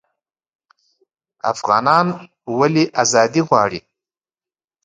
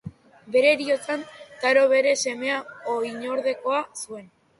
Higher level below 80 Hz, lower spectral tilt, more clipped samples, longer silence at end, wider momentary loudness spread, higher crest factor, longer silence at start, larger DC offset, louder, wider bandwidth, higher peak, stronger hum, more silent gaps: first, -60 dBFS vs -68 dBFS; first, -4.5 dB/octave vs -2.5 dB/octave; neither; first, 1.05 s vs 0.35 s; second, 11 LU vs 16 LU; about the same, 20 dB vs 18 dB; first, 1.45 s vs 0.05 s; neither; first, -16 LUFS vs -23 LUFS; second, 9.6 kHz vs 11.5 kHz; first, 0 dBFS vs -6 dBFS; neither; neither